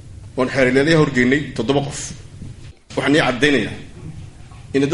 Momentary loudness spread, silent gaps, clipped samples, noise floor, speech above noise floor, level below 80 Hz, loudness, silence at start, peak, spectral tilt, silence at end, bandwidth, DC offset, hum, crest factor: 21 LU; none; under 0.1%; -37 dBFS; 20 dB; -42 dBFS; -17 LUFS; 0.05 s; -2 dBFS; -5 dB/octave; 0 s; 11.5 kHz; under 0.1%; none; 18 dB